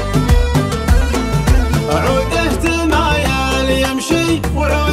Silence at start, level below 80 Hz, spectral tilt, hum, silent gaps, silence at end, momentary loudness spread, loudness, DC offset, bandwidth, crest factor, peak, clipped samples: 0 s; -18 dBFS; -5.5 dB/octave; none; none; 0 s; 2 LU; -15 LUFS; under 0.1%; 15.5 kHz; 14 dB; 0 dBFS; under 0.1%